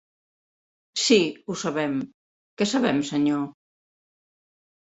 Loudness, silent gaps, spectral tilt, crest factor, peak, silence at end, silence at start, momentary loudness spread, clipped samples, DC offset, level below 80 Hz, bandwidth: -24 LUFS; 2.14-2.57 s; -4 dB/octave; 20 dB; -6 dBFS; 1.35 s; 0.95 s; 12 LU; under 0.1%; under 0.1%; -68 dBFS; 8.4 kHz